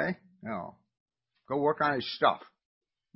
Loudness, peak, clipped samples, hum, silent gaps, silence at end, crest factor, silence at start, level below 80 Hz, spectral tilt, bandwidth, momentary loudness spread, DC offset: -31 LUFS; -10 dBFS; under 0.1%; none; 1.00-1.06 s; 0.75 s; 22 dB; 0 s; -70 dBFS; -9 dB/octave; 5.8 kHz; 13 LU; under 0.1%